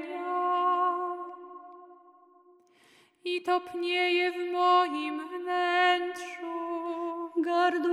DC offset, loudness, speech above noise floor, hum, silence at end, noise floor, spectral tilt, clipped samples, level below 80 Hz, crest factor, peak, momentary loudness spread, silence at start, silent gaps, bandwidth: under 0.1%; -28 LUFS; 34 dB; none; 0 s; -62 dBFS; -2 dB/octave; under 0.1%; -88 dBFS; 18 dB; -12 dBFS; 13 LU; 0 s; none; 12 kHz